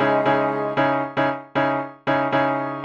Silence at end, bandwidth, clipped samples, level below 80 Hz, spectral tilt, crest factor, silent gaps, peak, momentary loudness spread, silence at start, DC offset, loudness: 0 s; 7.6 kHz; under 0.1%; -60 dBFS; -7.5 dB/octave; 14 dB; none; -6 dBFS; 4 LU; 0 s; under 0.1%; -21 LUFS